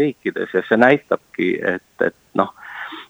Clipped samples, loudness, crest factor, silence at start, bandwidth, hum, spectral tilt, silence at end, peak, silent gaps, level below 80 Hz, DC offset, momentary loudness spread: under 0.1%; -19 LUFS; 20 dB; 0 s; over 20 kHz; none; -7 dB/octave; 0.05 s; 0 dBFS; none; -66 dBFS; under 0.1%; 10 LU